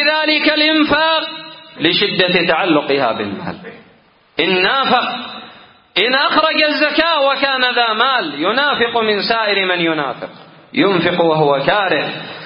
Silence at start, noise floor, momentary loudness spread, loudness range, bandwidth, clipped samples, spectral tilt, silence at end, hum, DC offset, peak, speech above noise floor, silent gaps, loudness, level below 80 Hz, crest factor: 0 s; -50 dBFS; 13 LU; 3 LU; 5.4 kHz; under 0.1%; -7.5 dB/octave; 0 s; none; under 0.1%; 0 dBFS; 35 dB; none; -14 LUFS; -54 dBFS; 16 dB